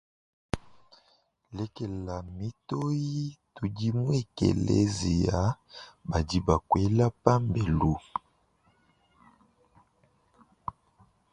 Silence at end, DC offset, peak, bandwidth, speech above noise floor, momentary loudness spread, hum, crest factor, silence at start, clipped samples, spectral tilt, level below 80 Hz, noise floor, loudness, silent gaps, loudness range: 0.6 s; under 0.1%; -2 dBFS; 11 kHz; 40 dB; 14 LU; none; 28 dB; 0.55 s; under 0.1%; -7 dB/octave; -44 dBFS; -68 dBFS; -29 LUFS; none; 9 LU